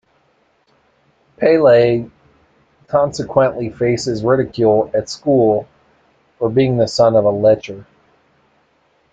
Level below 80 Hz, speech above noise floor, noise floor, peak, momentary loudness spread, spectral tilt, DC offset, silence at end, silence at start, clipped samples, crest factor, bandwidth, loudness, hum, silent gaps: -52 dBFS; 45 dB; -59 dBFS; 0 dBFS; 9 LU; -6.5 dB/octave; under 0.1%; 1.3 s; 1.4 s; under 0.1%; 16 dB; 8.8 kHz; -15 LUFS; none; none